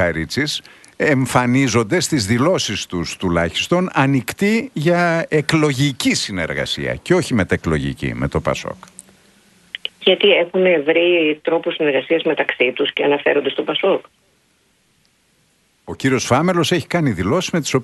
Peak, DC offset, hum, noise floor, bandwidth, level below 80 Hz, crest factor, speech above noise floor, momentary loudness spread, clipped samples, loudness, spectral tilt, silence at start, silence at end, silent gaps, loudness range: 0 dBFS; under 0.1%; none; -60 dBFS; 12 kHz; -44 dBFS; 18 dB; 43 dB; 8 LU; under 0.1%; -17 LUFS; -5 dB/octave; 0 s; 0 s; none; 5 LU